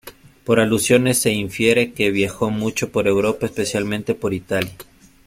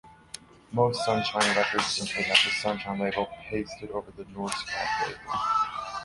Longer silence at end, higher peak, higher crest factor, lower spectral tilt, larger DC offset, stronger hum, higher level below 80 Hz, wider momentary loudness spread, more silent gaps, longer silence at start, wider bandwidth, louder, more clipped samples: first, 0.45 s vs 0 s; first, -2 dBFS vs -6 dBFS; second, 18 dB vs 24 dB; first, -4.5 dB/octave vs -3 dB/octave; neither; neither; first, -50 dBFS vs -58 dBFS; second, 8 LU vs 15 LU; neither; about the same, 0.05 s vs 0.05 s; first, 16.5 kHz vs 11.5 kHz; first, -19 LUFS vs -27 LUFS; neither